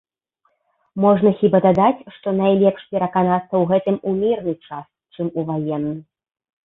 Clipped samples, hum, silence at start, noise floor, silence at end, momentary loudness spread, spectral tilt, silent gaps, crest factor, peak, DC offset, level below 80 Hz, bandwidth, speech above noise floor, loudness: under 0.1%; none; 0.95 s; -68 dBFS; 0.6 s; 13 LU; -10.5 dB/octave; none; 16 dB; -2 dBFS; under 0.1%; -58 dBFS; 4 kHz; 50 dB; -19 LUFS